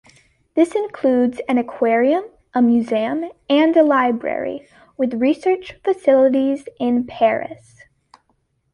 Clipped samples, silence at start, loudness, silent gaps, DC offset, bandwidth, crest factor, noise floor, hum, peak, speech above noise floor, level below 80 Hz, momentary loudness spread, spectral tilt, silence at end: under 0.1%; 0.55 s; -18 LUFS; none; under 0.1%; 11 kHz; 16 dB; -66 dBFS; none; -2 dBFS; 49 dB; -60 dBFS; 11 LU; -6 dB/octave; 1.2 s